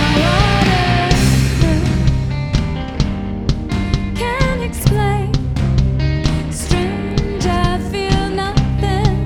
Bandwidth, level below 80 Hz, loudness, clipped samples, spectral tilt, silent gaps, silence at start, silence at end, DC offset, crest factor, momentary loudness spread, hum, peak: 16.5 kHz; -22 dBFS; -17 LUFS; under 0.1%; -6 dB/octave; none; 0 s; 0 s; under 0.1%; 14 dB; 7 LU; none; 0 dBFS